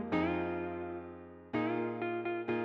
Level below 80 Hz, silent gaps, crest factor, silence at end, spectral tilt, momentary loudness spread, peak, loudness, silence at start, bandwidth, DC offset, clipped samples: -64 dBFS; none; 16 dB; 0 s; -8.5 dB/octave; 11 LU; -20 dBFS; -36 LUFS; 0 s; 6 kHz; under 0.1%; under 0.1%